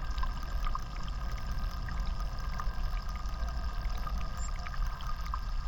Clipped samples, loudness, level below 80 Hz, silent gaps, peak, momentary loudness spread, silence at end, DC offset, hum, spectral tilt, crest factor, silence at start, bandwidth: under 0.1%; -39 LUFS; -34 dBFS; none; -20 dBFS; 2 LU; 0 s; under 0.1%; none; -5 dB/octave; 12 dB; 0 s; 17.5 kHz